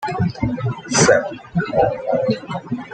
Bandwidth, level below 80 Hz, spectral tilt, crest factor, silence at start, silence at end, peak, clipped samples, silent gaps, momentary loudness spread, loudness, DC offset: 9.2 kHz; -44 dBFS; -4.5 dB/octave; 18 dB; 0 s; 0 s; -2 dBFS; under 0.1%; none; 11 LU; -19 LUFS; under 0.1%